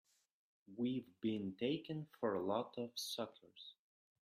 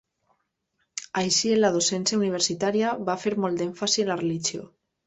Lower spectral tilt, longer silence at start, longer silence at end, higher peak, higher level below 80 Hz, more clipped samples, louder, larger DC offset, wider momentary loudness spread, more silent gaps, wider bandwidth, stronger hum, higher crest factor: first, -5 dB/octave vs -3 dB/octave; second, 0.7 s vs 0.95 s; about the same, 0.5 s vs 0.4 s; second, -26 dBFS vs -10 dBFS; second, -84 dBFS vs -66 dBFS; neither; second, -43 LUFS vs -24 LUFS; neither; first, 17 LU vs 9 LU; neither; first, 15.5 kHz vs 8.4 kHz; neither; about the same, 18 dB vs 16 dB